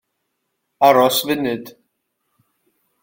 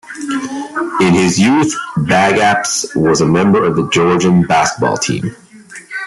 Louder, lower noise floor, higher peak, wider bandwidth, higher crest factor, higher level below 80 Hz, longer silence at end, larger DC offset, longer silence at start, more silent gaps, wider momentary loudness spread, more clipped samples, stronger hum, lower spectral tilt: second, -16 LUFS vs -13 LUFS; first, -74 dBFS vs -34 dBFS; about the same, -2 dBFS vs 0 dBFS; first, 17 kHz vs 12 kHz; first, 20 dB vs 12 dB; second, -62 dBFS vs -48 dBFS; first, 1.3 s vs 0 s; neither; first, 0.8 s vs 0.05 s; neither; about the same, 12 LU vs 10 LU; neither; neither; about the same, -3.5 dB/octave vs -4.5 dB/octave